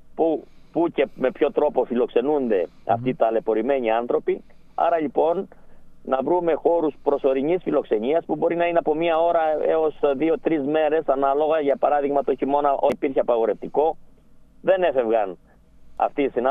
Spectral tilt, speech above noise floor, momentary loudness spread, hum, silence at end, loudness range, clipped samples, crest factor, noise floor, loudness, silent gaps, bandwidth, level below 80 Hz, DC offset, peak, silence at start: -8 dB/octave; 28 dB; 5 LU; none; 0 s; 2 LU; under 0.1%; 16 dB; -49 dBFS; -22 LUFS; none; 4.1 kHz; -52 dBFS; under 0.1%; -4 dBFS; 0.05 s